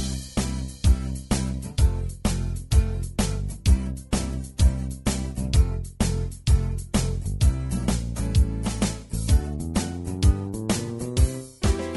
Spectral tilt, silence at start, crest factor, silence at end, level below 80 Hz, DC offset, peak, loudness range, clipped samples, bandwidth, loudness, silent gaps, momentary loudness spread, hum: -5.5 dB/octave; 0 s; 16 dB; 0 s; -26 dBFS; under 0.1%; -8 dBFS; 1 LU; under 0.1%; 12 kHz; -26 LUFS; none; 5 LU; none